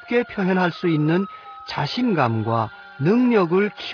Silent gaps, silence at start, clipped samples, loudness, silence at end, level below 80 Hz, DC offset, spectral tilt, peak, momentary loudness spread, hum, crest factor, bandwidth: none; 0 s; under 0.1%; -21 LUFS; 0 s; -62 dBFS; under 0.1%; -8 dB/octave; -6 dBFS; 11 LU; none; 16 dB; 5.4 kHz